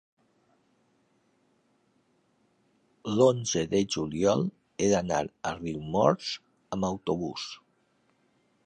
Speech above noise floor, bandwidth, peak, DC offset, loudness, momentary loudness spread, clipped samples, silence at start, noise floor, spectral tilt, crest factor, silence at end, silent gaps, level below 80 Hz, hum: 42 dB; 10 kHz; -8 dBFS; under 0.1%; -28 LUFS; 14 LU; under 0.1%; 3.05 s; -70 dBFS; -5 dB/octave; 24 dB; 1.1 s; none; -58 dBFS; none